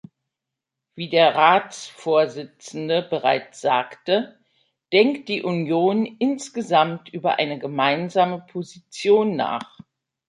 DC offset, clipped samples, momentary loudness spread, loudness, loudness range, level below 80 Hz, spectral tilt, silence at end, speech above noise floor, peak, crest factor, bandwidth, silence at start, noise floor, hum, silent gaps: under 0.1%; under 0.1%; 15 LU; -21 LUFS; 2 LU; -72 dBFS; -5 dB/octave; 0.65 s; 64 dB; -2 dBFS; 20 dB; 11.5 kHz; 0.95 s; -85 dBFS; none; none